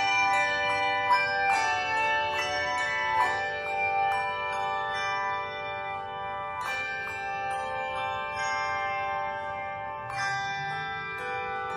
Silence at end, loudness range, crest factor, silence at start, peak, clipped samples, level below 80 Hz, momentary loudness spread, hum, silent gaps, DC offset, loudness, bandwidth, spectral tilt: 0 s; 6 LU; 16 dB; 0 s; -12 dBFS; under 0.1%; -60 dBFS; 9 LU; none; none; under 0.1%; -28 LUFS; 13.5 kHz; -2 dB/octave